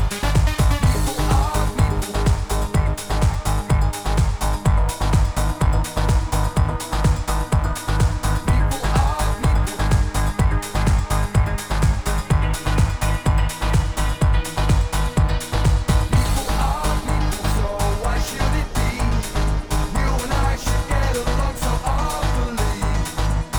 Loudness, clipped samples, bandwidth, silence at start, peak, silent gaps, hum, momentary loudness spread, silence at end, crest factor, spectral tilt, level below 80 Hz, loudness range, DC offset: -21 LUFS; under 0.1%; over 20 kHz; 0 s; -4 dBFS; none; none; 3 LU; 0 s; 14 dB; -5.5 dB/octave; -22 dBFS; 2 LU; under 0.1%